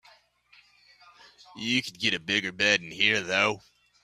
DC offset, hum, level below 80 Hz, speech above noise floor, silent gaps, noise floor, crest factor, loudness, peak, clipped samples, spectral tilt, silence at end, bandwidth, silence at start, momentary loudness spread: under 0.1%; 60 Hz at -65 dBFS; -68 dBFS; 34 dB; none; -61 dBFS; 22 dB; -25 LUFS; -6 dBFS; under 0.1%; -2.5 dB/octave; 0.45 s; 14.5 kHz; 1.55 s; 5 LU